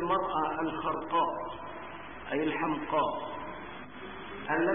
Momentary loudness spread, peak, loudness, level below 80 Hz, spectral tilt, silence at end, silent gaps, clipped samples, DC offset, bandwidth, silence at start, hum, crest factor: 13 LU; -16 dBFS; -33 LUFS; -60 dBFS; -9 dB/octave; 0 s; none; under 0.1%; 0.3%; 3.7 kHz; 0 s; none; 16 dB